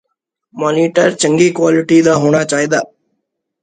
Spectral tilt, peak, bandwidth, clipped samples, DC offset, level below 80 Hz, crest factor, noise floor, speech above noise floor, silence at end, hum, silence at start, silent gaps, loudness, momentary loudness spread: -5 dB/octave; 0 dBFS; 9.4 kHz; under 0.1%; under 0.1%; -56 dBFS; 14 dB; -71 dBFS; 59 dB; 0.75 s; none; 0.55 s; none; -12 LUFS; 7 LU